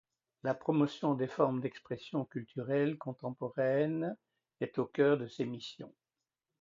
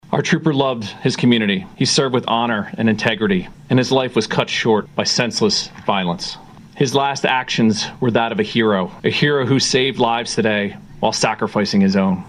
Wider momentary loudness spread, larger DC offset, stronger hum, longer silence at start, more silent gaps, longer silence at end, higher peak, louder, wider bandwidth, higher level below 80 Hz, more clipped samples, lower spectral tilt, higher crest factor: first, 12 LU vs 5 LU; neither; neither; first, 0.45 s vs 0.1 s; neither; first, 0.75 s vs 0 s; second, -16 dBFS vs 0 dBFS; second, -35 LUFS vs -17 LUFS; second, 7.6 kHz vs 12 kHz; second, -78 dBFS vs -50 dBFS; neither; first, -8 dB/octave vs -4.5 dB/octave; about the same, 20 dB vs 18 dB